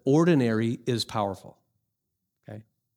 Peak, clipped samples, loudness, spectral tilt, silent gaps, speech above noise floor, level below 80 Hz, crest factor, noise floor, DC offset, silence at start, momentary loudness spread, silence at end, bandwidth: -10 dBFS; under 0.1%; -25 LUFS; -6.5 dB/octave; none; 57 dB; -68 dBFS; 16 dB; -82 dBFS; under 0.1%; 0.05 s; 24 LU; 0.35 s; 15 kHz